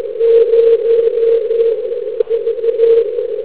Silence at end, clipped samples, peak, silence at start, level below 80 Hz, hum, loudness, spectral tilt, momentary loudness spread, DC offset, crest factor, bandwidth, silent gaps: 0 s; under 0.1%; 0 dBFS; 0 s; -58 dBFS; none; -13 LUFS; -8 dB/octave; 8 LU; 1%; 12 dB; 4 kHz; none